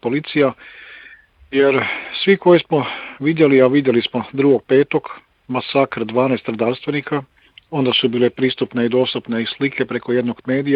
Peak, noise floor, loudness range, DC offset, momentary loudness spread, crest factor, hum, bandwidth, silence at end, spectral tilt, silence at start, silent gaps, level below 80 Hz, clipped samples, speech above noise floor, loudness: 0 dBFS; -45 dBFS; 4 LU; under 0.1%; 11 LU; 18 dB; none; 5.2 kHz; 0 s; -9.5 dB/octave; 0.05 s; none; -60 dBFS; under 0.1%; 28 dB; -17 LUFS